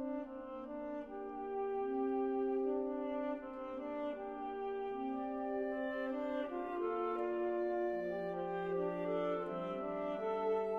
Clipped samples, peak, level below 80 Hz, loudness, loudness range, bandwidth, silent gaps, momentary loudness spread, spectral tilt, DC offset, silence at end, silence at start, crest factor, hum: under 0.1%; -26 dBFS; -70 dBFS; -40 LUFS; 2 LU; 5 kHz; none; 8 LU; -8 dB/octave; under 0.1%; 0 s; 0 s; 12 dB; none